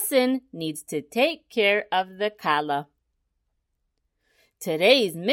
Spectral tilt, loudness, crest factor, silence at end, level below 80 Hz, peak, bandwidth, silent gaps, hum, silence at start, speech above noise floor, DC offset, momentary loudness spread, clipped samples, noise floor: -3.5 dB/octave; -24 LUFS; 22 dB; 0 s; -74 dBFS; -4 dBFS; 16.5 kHz; none; none; 0 s; 52 dB; under 0.1%; 13 LU; under 0.1%; -76 dBFS